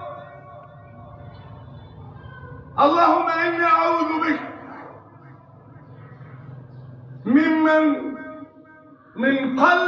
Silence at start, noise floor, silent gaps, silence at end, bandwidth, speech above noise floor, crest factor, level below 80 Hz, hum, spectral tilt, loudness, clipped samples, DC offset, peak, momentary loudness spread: 0 s; -48 dBFS; none; 0 s; 7 kHz; 30 dB; 20 dB; -58 dBFS; none; -6.5 dB/octave; -19 LUFS; under 0.1%; under 0.1%; -2 dBFS; 25 LU